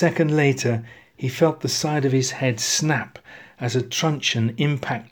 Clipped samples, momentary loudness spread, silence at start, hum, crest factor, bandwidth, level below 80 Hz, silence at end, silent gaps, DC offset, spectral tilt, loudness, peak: under 0.1%; 9 LU; 0 s; none; 18 dB; over 20 kHz; -62 dBFS; 0.05 s; none; under 0.1%; -4.5 dB/octave; -22 LUFS; -4 dBFS